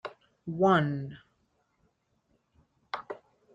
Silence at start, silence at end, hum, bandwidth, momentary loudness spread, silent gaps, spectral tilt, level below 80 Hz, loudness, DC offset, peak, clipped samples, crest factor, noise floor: 0.05 s; 0.4 s; none; 7.6 kHz; 21 LU; none; -8 dB/octave; -68 dBFS; -29 LUFS; under 0.1%; -12 dBFS; under 0.1%; 22 dB; -73 dBFS